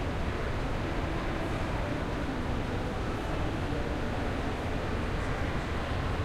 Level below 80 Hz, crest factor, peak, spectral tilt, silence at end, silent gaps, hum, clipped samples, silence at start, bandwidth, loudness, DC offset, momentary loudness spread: -36 dBFS; 14 dB; -18 dBFS; -6.5 dB/octave; 0 s; none; none; under 0.1%; 0 s; 14.5 kHz; -33 LUFS; under 0.1%; 1 LU